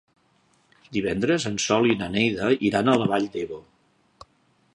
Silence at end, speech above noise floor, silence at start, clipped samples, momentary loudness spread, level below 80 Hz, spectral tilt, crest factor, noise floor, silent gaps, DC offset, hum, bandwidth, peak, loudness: 1.15 s; 41 dB; 0.9 s; under 0.1%; 11 LU; -56 dBFS; -4.5 dB/octave; 20 dB; -64 dBFS; none; under 0.1%; none; 11 kHz; -4 dBFS; -23 LUFS